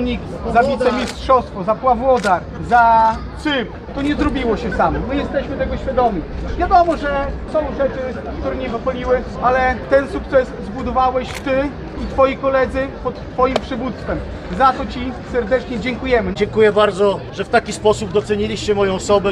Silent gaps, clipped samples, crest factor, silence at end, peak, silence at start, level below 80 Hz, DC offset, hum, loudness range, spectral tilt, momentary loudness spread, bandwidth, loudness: none; under 0.1%; 16 dB; 0 s; -2 dBFS; 0 s; -32 dBFS; under 0.1%; none; 3 LU; -6 dB/octave; 10 LU; 11.5 kHz; -18 LUFS